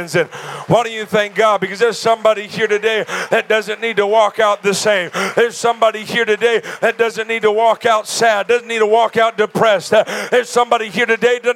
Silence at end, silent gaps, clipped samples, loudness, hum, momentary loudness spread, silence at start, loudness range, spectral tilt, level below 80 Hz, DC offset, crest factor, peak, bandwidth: 0 s; none; under 0.1%; -15 LUFS; none; 4 LU; 0 s; 1 LU; -3.5 dB/octave; -66 dBFS; under 0.1%; 14 dB; 0 dBFS; 16 kHz